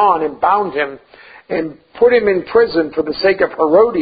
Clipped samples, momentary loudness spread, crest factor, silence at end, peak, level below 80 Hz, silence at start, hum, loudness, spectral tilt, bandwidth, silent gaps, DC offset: under 0.1%; 10 LU; 14 dB; 0 s; 0 dBFS; -50 dBFS; 0 s; none; -15 LUFS; -10.5 dB/octave; 5 kHz; none; under 0.1%